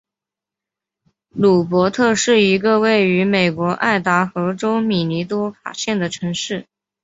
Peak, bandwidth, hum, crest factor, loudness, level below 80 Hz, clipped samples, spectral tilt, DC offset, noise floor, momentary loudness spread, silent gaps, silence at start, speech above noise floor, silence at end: -2 dBFS; 8 kHz; none; 16 dB; -17 LUFS; -58 dBFS; under 0.1%; -5 dB/octave; under 0.1%; -87 dBFS; 9 LU; none; 1.35 s; 70 dB; 0.4 s